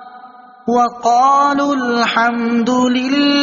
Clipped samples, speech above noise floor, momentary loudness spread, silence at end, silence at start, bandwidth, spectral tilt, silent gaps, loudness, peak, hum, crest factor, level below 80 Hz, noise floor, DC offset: under 0.1%; 26 dB; 5 LU; 0 s; 0 s; 7.4 kHz; -1.5 dB/octave; none; -14 LUFS; -2 dBFS; none; 12 dB; -58 dBFS; -39 dBFS; under 0.1%